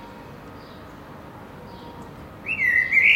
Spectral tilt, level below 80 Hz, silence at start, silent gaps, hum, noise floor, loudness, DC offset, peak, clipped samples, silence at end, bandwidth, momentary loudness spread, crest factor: -3.5 dB/octave; -52 dBFS; 0 s; none; none; -41 dBFS; -19 LUFS; under 0.1%; -6 dBFS; under 0.1%; 0 s; 16 kHz; 24 LU; 20 dB